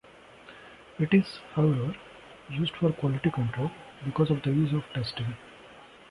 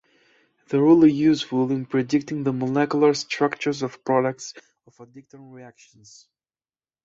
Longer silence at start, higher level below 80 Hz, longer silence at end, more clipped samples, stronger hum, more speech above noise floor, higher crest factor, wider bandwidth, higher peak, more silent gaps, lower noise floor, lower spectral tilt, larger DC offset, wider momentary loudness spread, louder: second, 0.45 s vs 0.7 s; first, -58 dBFS vs -64 dBFS; second, 0.25 s vs 1.35 s; neither; neither; second, 24 dB vs over 68 dB; about the same, 20 dB vs 18 dB; first, 11 kHz vs 7.8 kHz; about the same, -8 dBFS vs -6 dBFS; neither; second, -52 dBFS vs under -90 dBFS; first, -8 dB/octave vs -6 dB/octave; neither; first, 23 LU vs 11 LU; second, -29 LUFS vs -21 LUFS